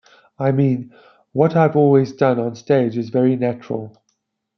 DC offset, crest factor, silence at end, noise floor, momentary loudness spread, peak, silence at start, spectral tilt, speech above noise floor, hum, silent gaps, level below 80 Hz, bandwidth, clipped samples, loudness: under 0.1%; 16 dB; 0.7 s; -71 dBFS; 13 LU; -2 dBFS; 0.4 s; -9 dB/octave; 54 dB; none; none; -64 dBFS; 6.4 kHz; under 0.1%; -18 LUFS